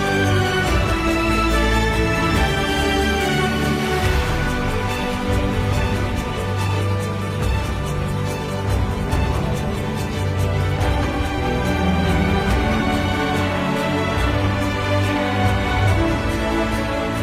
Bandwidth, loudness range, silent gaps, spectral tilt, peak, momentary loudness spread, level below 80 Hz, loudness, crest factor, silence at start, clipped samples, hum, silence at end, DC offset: 15.5 kHz; 4 LU; none; -5.5 dB/octave; -6 dBFS; 5 LU; -26 dBFS; -20 LUFS; 14 dB; 0 s; under 0.1%; none; 0 s; under 0.1%